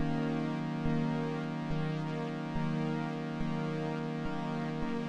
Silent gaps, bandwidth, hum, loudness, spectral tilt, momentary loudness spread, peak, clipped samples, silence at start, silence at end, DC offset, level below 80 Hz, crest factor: none; 8.6 kHz; none; -35 LUFS; -8 dB/octave; 4 LU; -20 dBFS; under 0.1%; 0 s; 0 s; under 0.1%; -52 dBFS; 14 dB